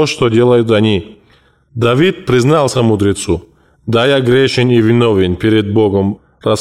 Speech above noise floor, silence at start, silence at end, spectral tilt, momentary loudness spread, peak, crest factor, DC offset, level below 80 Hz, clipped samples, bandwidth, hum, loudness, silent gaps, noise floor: 39 dB; 0 s; 0 s; -6 dB/octave; 9 LU; -2 dBFS; 10 dB; 0.3%; -40 dBFS; under 0.1%; 13 kHz; none; -12 LUFS; none; -50 dBFS